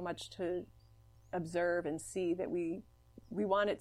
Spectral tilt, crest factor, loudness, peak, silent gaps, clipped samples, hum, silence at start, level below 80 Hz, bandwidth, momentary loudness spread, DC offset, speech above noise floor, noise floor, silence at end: -5.5 dB/octave; 18 dB; -38 LUFS; -20 dBFS; none; under 0.1%; 60 Hz at -65 dBFS; 0 s; -66 dBFS; 13.5 kHz; 10 LU; under 0.1%; 26 dB; -62 dBFS; 0 s